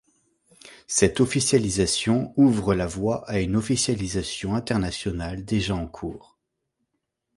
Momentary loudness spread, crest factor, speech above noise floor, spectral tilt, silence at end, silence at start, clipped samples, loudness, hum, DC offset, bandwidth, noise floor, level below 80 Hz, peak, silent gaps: 10 LU; 22 dB; 55 dB; -4.5 dB/octave; 1.2 s; 0.65 s; under 0.1%; -24 LUFS; none; under 0.1%; 11.5 kHz; -79 dBFS; -44 dBFS; -4 dBFS; none